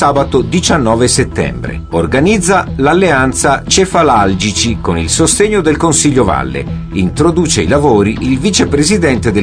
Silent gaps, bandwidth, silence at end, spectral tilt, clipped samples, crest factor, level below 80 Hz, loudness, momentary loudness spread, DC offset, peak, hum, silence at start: none; 10.5 kHz; 0 s; -4.5 dB/octave; under 0.1%; 10 dB; -26 dBFS; -11 LUFS; 7 LU; under 0.1%; 0 dBFS; none; 0 s